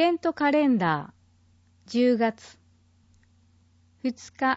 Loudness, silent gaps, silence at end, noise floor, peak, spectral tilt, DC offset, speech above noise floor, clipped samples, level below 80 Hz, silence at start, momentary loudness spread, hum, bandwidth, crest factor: -25 LUFS; none; 0 s; -61 dBFS; -10 dBFS; -6 dB/octave; under 0.1%; 37 dB; under 0.1%; -68 dBFS; 0 s; 11 LU; none; 8 kHz; 16 dB